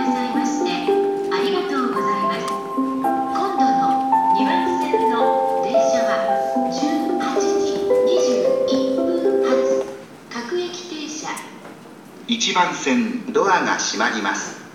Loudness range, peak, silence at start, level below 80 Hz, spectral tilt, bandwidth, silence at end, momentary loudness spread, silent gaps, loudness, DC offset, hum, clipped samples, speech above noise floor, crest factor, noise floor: 5 LU; -4 dBFS; 0 s; -64 dBFS; -3.5 dB/octave; 15.5 kHz; 0 s; 11 LU; none; -20 LUFS; under 0.1%; none; under 0.1%; 21 dB; 16 dB; -40 dBFS